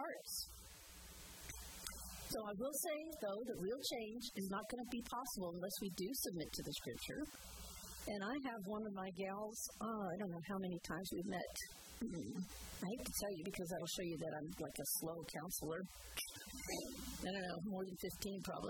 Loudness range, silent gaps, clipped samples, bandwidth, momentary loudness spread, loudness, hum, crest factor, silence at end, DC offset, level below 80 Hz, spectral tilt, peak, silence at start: 2 LU; none; under 0.1%; 19 kHz; 7 LU; -46 LUFS; none; 20 dB; 0 s; under 0.1%; -64 dBFS; -3.5 dB/octave; -26 dBFS; 0 s